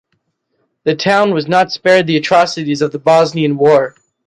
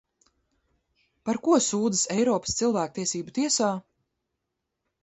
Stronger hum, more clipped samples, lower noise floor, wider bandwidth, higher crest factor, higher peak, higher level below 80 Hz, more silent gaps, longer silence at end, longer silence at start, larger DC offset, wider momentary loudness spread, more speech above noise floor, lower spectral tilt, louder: neither; neither; second, -66 dBFS vs -82 dBFS; first, 11 kHz vs 8.2 kHz; second, 12 dB vs 18 dB; first, 0 dBFS vs -10 dBFS; about the same, -58 dBFS vs -62 dBFS; neither; second, 0.4 s vs 1.25 s; second, 0.85 s vs 1.25 s; neither; about the same, 6 LU vs 8 LU; about the same, 54 dB vs 57 dB; first, -5.5 dB/octave vs -3.5 dB/octave; first, -13 LUFS vs -25 LUFS